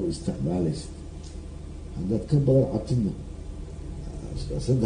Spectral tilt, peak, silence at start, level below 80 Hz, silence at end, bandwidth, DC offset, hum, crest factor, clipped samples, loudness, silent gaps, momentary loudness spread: -8 dB/octave; -10 dBFS; 0 s; -38 dBFS; 0 s; 10 kHz; under 0.1%; none; 16 dB; under 0.1%; -27 LUFS; none; 18 LU